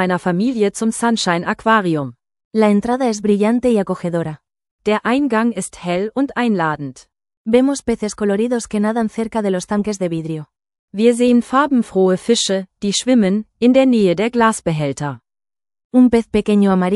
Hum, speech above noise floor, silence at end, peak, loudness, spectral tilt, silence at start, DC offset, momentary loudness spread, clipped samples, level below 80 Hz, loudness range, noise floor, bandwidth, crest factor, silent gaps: none; over 74 dB; 0 s; 0 dBFS; -17 LUFS; -5.5 dB/octave; 0 s; under 0.1%; 10 LU; under 0.1%; -50 dBFS; 4 LU; under -90 dBFS; 12 kHz; 16 dB; 2.45-2.51 s, 4.71-4.79 s, 7.37-7.45 s, 10.79-10.88 s, 15.85-15.90 s